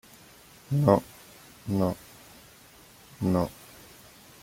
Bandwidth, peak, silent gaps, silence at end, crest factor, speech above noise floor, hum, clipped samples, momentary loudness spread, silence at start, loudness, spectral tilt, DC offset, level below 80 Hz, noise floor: 16.5 kHz; -6 dBFS; none; 0.9 s; 24 dB; 29 dB; none; under 0.1%; 27 LU; 0.7 s; -27 LUFS; -7.5 dB/octave; under 0.1%; -58 dBFS; -53 dBFS